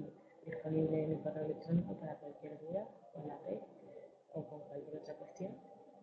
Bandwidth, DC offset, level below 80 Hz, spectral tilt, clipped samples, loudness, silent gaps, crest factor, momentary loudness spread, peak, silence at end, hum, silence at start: 6.6 kHz; under 0.1%; -76 dBFS; -9.5 dB/octave; under 0.1%; -43 LUFS; none; 18 dB; 18 LU; -24 dBFS; 0 s; none; 0 s